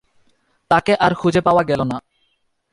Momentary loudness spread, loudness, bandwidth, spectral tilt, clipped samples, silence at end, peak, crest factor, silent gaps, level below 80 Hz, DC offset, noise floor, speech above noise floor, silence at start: 8 LU; -17 LUFS; 11.5 kHz; -6.5 dB/octave; under 0.1%; 0.7 s; -2 dBFS; 18 dB; none; -48 dBFS; under 0.1%; -66 dBFS; 50 dB; 0.7 s